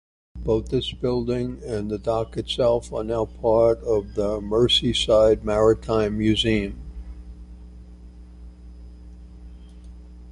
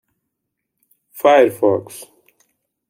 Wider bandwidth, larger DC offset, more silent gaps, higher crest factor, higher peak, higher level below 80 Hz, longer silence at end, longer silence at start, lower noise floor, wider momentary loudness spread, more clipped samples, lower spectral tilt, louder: second, 11.5 kHz vs 16.5 kHz; neither; neither; about the same, 18 dB vs 18 dB; second, -6 dBFS vs -2 dBFS; first, -38 dBFS vs -72 dBFS; second, 0 s vs 0.85 s; second, 0.35 s vs 1.15 s; second, -43 dBFS vs -78 dBFS; second, 15 LU vs 23 LU; neither; about the same, -5.5 dB/octave vs -5 dB/octave; second, -22 LUFS vs -15 LUFS